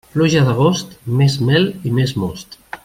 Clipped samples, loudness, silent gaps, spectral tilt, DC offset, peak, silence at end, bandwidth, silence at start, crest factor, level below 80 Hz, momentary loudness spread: under 0.1%; -16 LUFS; none; -6 dB/octave; under 0.1%; -2 dBFS; 0.1 s; 15.5 kHz; 0.15 s; 14 dB; -48 dBFS; 11 LU